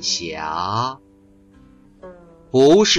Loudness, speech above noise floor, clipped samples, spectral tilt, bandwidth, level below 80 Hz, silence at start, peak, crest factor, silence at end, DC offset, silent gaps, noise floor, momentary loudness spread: -19 LUFS; 34 dB; under 0.1%; -3.5 dB/octave; 10 kHz; -52 dBFS; 0 s; -4 dBFS; 16 dB; 0 s; under 0.1%; none; -51 dBFS; 14 LU